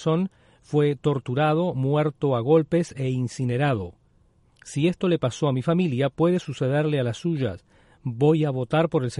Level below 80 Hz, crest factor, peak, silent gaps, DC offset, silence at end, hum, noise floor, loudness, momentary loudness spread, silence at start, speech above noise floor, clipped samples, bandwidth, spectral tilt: -58 dBFS; 16 dB; -8 dBFS; none; under 0.1%; 0 s; none; -60 dBFS; -24 LUFS; 7 LU; 0 s; 37 dB; under 0.1%; 11.5 kHz; -7.5 dB/octave